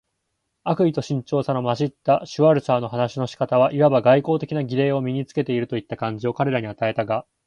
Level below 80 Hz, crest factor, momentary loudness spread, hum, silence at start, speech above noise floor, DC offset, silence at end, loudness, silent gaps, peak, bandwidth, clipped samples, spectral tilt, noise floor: -60 dBFS; 18 dB; 9 LU; none; 0.65 s; 55 dB; under 0.1%; 0.25 s; -21 LUFS; none; -4 dBFS; 9.6 kHz; under 0.1%; -7.5 dB/octave; -76 dBFS